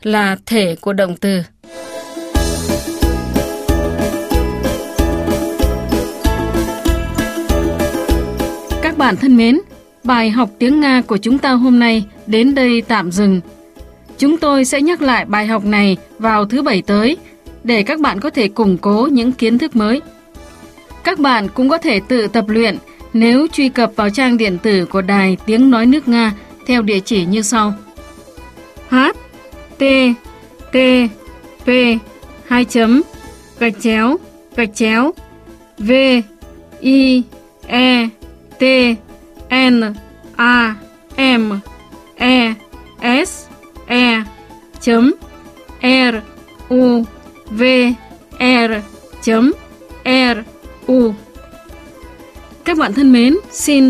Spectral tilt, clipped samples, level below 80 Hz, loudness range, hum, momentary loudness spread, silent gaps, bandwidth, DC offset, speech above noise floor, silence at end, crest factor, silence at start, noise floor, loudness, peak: -5 dB/octave; under 0.1%; -30 dBFS; 5 LU; none; 11 LU; none; 15.5 kHz; under 0.1%; 27 dB; 0 s; 14 dB; 0.05 s; -40 dBFS; -14 LUFS; 0 dBFS